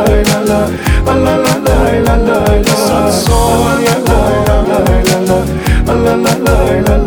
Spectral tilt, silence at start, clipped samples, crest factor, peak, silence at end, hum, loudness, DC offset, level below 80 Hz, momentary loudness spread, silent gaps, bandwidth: -5.5 dB/octave; 0 s; under 0.1%; 10 dB; 0 dBFS; 0 s; none; -10 LUFS; under 0.1%; -16 dBFS; 2 LU; none; over 20 kHz